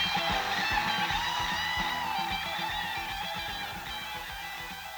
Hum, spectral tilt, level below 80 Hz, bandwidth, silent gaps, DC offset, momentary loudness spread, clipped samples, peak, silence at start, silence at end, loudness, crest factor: none; -2 dB/octave; -50 dBFS; over 20 kHz; none; under 0.1%; 9 LU; under 0.1%; -16 dBFS; 0 s; 0 s; -31 LUFS; 16 dB